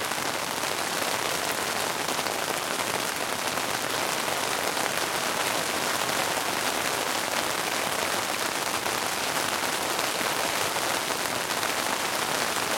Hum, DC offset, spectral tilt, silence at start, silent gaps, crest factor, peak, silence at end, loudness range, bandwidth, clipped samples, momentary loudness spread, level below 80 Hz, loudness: none; under 0.1%; -1 dB/octave; 0 s; none; 22 dB; -6 dBFS; 0 s; 1 LU; 17 kHz; under 0.1%; 2 LU; -64 dBFS; -26 LUFS